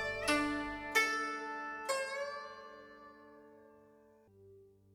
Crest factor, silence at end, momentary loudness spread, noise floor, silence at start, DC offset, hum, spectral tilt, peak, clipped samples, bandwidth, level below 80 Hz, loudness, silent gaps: 22 dB; 0.25 s; 24 LU; -64 dBFS; 0 s; under 0.1%; none; -2.5 dB/octave; -18 dBFS; under 0.1%; over 20 kHz; -64 dBFS; -36 LUFS; none